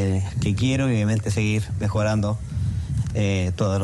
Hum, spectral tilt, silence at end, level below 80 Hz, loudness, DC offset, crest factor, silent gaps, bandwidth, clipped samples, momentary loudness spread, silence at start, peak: none; -6.5 dB/octave; 0 s; -38 dBFS; -23 LUFS; under 0.1%; 12 dB; none; 12 kHz; under 0.1%; 5 LU; 0 s; -10 dBFS